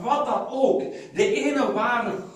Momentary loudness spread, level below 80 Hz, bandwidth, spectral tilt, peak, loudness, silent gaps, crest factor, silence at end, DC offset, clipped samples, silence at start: 4 LU; -64 dBFS; 11.5 kHz; -4.5 dB/octave; -6 dBFS; -23 LUFS; none; 18 dB; 0 s; under 0.1%; under 0.1%; 0 s